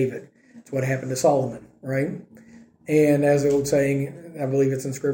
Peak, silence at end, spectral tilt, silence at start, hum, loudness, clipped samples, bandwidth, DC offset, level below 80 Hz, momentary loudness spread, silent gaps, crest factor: -8 dBFS; 0 s; -6.5 dB/octave; 0 s; none; -23 LUFS; under 0.1%; 17 kHz; under 0.1%; -58 dBFS; 13 LU; none; 16 dB